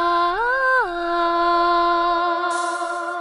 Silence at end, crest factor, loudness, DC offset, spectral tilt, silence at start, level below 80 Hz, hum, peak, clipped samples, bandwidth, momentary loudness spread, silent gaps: 0 s; 12 dB; -19 LUFS; under 0.1%; -2.5 dB/octave; 0 s; -48 dBFS; none; -8 dBFS; under 0.1%; 10.5 kHz; 6 LU; none